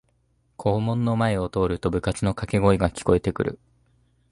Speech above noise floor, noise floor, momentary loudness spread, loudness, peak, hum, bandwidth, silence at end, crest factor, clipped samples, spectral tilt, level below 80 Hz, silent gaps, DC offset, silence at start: 44 dB; -66 dBFS; 7 LU; -24 LUFS; -4 dBFS; none; 11.5 kHz; 0.75 s; 20 dB; under 0.1%; -7 dB/octave; -40 dBFS; none; under 0.1%; 0.6 s